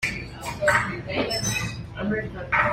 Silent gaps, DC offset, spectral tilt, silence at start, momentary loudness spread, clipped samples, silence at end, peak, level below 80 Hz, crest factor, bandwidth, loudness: none; under 0.1%; -3.5 dB/octave; 0 s; 10 LU; under 0.1%; 0 s; -6 dBFS; -44 dBFS; 20 dB; 16 kHz; -25 LUFS